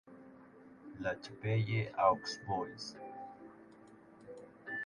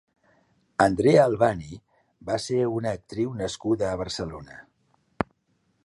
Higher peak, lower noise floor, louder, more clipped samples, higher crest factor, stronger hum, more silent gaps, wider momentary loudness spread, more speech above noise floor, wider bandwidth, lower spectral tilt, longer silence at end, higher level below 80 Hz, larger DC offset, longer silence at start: second, -14 dBFS vs -4 dBFS; second, -59 dBFS vs -70 dBFS; second, -37 LUFS vs -25 LUFS; neither; about the same, 24 dB vs 22 dB; neither; neither; first, 26 LU vs 21 LU; second, 23 dB vs 46 dB; about the same, 10.5 kHz vs 11.5 kHz; about the same, -6 dB/octave vs -6 dB/octave; second, 0 s vs 0.6 s; second, -68 dBFS vs -52 dBFS; neither; second, 0.05 s vs 0.8 s